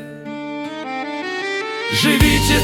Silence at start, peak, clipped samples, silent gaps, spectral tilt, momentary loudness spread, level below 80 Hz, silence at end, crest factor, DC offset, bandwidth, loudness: 0 s; -2 dBFS; under 0.1%; none; -4 dB/octave; 15 LU; -30 dBFS; 0 s; 18 dB; under 0.1%; 19 kHz; -18 LUFS